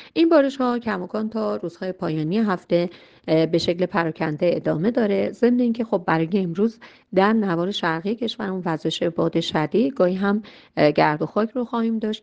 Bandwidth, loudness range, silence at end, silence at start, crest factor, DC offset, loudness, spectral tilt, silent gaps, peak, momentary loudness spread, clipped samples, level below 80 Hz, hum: 8.4 kHz; 2 LU; 0.05 s; 0 s; 18 dB; under 0.1%; -22 LUFS; -7 dB/octave; none; -4 dBFS; 8 LU; under 0.1%; -60 dBFS; none